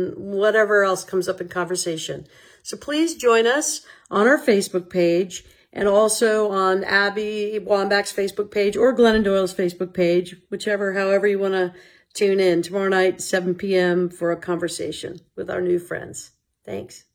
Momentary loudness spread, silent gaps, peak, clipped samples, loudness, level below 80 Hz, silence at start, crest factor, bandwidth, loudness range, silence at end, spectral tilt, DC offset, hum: 15 LU; none; -4 dBFS; under 0.1%; -20 LUFS; -54 dBFS; 0 s; 18 dB; 18.5 kHz; 3 LU; 0.15 s; -4 dB/octave; under 0.1%; none